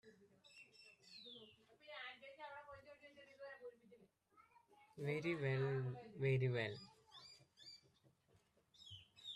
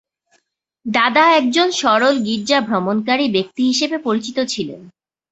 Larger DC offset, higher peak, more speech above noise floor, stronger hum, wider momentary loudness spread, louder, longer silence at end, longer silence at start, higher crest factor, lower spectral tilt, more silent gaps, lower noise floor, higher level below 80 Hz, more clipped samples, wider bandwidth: neither; second, -28 dBFS vs -2 dBFS; second, 36 dB vs 49 dB; neither; first, 22 LU vs 9 LU; second, -45 LUFS vs -16 LUFS; second, 0 s vs 0.4 s; second, 0.05 s vs 0.85 s; about the same, 20 dB vs 16 dB; first, -7 dB/octave vs -3.5 dB/octave; neither; first, -77 dBFS vs -66 dBFS; second, -82 dBFS vs -62 dBFS; neither; first, 9.8 kHz vs 8.2 kHz